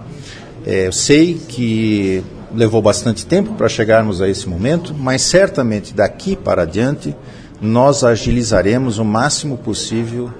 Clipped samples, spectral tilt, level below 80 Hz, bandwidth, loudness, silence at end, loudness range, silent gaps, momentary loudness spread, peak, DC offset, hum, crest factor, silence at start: under 0.1%; -5 dB/octave; -36 dBFS; 10.5 kHz; -15 LUFS; 0 s; 2 LU; none; 10 LU; 0 dBFS; 0.1%; none; 16 dB; 0 s